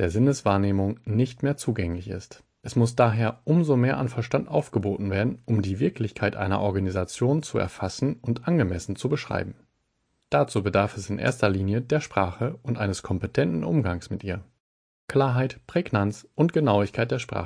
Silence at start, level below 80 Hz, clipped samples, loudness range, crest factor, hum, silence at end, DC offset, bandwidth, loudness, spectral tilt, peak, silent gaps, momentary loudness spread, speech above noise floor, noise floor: 0 s; -52 dBFS; under 0.1%; 3 LU; 20 dB; none; 0 s; under 0.1%; 10.5 kHz; -25 LUFS; -7 dB/octave; -6 dBFS; 14.60-15.08 s; 8 LU; 49 dB; -73 dBFS